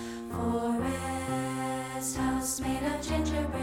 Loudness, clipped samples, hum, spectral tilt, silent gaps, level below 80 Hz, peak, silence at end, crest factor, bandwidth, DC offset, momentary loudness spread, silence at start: -31 LUFS; under 0.1%; none; -4.5 dB/octave; none; -44 dBFS; -18 dBFS; 0 s; 14 dB; 17 kHz; under 0.1%; 4 LU; 0 s